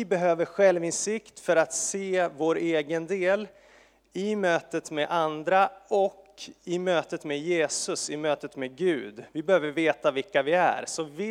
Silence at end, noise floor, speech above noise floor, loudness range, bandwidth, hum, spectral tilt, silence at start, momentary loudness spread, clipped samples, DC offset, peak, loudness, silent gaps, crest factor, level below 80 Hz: 0 s; -58 dBFS; 31 dB; 3 LU; 14.5 kHz; none; -3.5 dB/octave; 0 s; 9 LU; under 0.1%; under 0.1%; -8 dBFS; -27 LUFS; none; 18 dB; -72 dBFS